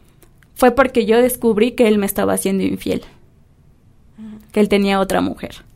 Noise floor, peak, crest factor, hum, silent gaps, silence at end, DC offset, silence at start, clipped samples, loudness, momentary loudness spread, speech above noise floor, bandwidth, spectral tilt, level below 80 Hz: -50 dBFS; 0 dBFS; 18 dB; none; none; 0.15 s; under 0.1%; 0.55 s; under 0.1%; -16 LUFS; 10 LU; 34 dB; 16 kHz; -5 dB/octave; -44 dBFS